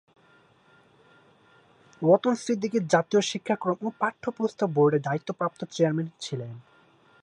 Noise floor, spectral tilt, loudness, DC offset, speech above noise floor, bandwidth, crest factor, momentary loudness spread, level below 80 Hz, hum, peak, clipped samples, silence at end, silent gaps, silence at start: -60 dBFS; -5.5 dB/octave; -26 LUFS; under 0.1%; 34 dB; 11 kHz; 22 dB; 11 LU; -74 dBFS; none; -6 dBFS; under 0.1%; 0.65 s; none; 2 s